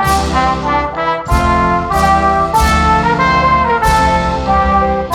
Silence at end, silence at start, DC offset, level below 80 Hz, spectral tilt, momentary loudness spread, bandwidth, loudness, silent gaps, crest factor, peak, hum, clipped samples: 0 s; 0 s; under 0.1%; -22 dBFS; -5 dB/octave; 4 LU; 19 kHz; -12 LUFS; none; 10 dB; -2 dBFS; none; under 0.1%